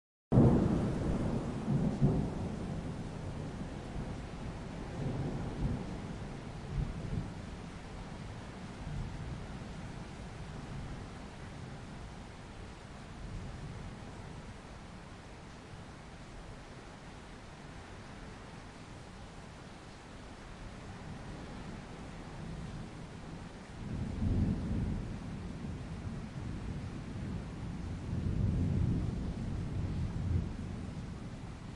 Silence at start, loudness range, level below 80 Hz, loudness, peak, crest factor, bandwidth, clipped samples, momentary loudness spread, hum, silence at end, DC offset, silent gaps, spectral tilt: 0.3 s; 13 LU; -46 dBFS; -39 LUFS; -12 dBFS; 26 dB; 11.5 kHz; under 0.1%; 16 LU; none; 0 s; under 0.1%; none; -7.5 dB/octave